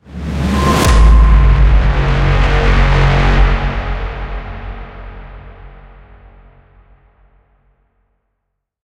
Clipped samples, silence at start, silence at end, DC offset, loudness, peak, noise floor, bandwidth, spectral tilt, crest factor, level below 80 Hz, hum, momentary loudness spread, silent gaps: under 0.1%; 0.1 s; 3.15 s; under 0.1%; -13 LUFS; 0 dBFS; -72 dBFS; 12.5 kHz; -6 dB/octave; 14 dB; -14 dBFS; none; 21 LU; none